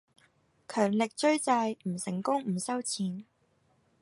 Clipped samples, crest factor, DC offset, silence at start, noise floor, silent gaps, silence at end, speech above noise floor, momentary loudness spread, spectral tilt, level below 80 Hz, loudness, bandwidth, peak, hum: under 0.1%; 18 dB; under 0.1%; 0.7 s; -70 dBFS; none; 0.8 s; 40 dB; 8 LU; -4.5 dB/octave; -78 dBFS; -30 LUFS; 11.5 kHz; -12 dBFS; none